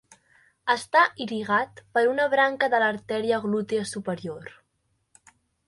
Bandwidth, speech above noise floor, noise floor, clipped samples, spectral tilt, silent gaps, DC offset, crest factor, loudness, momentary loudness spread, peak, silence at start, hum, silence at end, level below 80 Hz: 11.5 kHz; 49 dB; -73 dBFS; under 0.1%; -4.5 dB/octave; none; under 0.1%; 20 dB; -24 LUFS; 12 LU; -6 dBFS; 0.65 s; none; 1.2 s; -68 dBFS